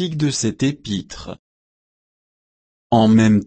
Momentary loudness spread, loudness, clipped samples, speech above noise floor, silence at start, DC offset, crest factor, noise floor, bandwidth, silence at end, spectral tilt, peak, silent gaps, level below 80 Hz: 21 LU; -18 LUFS; under 0.1%; over 73 dB; 0 s; under 0.1%; 16 dB; under -90 dBFS; 8.8 kHz; 0 s; -5.5 dB/octave; -4 dBFS; 1.39-2.90 s; -50 dBFS